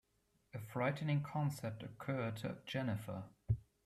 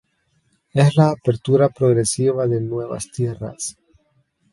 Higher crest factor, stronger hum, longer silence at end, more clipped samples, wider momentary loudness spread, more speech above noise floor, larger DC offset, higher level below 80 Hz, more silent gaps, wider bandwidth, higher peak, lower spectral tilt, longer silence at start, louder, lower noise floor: about the same, 18 dB vs 20 dB; neither; second, 0.25 s vs 0.8 s; neither; about the same, 10 LU vs 12 LU; second, 38 dB vs 47 dB; neither; second, -62 dBFS vs -54 dBFS; neither; first, 14.5 kHz vs 11.5 kHz; second, -24 dBFS vs 0 dBFS; about the same, -7 dB/octave vs -6.5 dB/octave; second, 0.55 s vs 0.75 s; second, -41 LUFS vs -19 LUFS; first, -79 dBFS vs -65 dBFS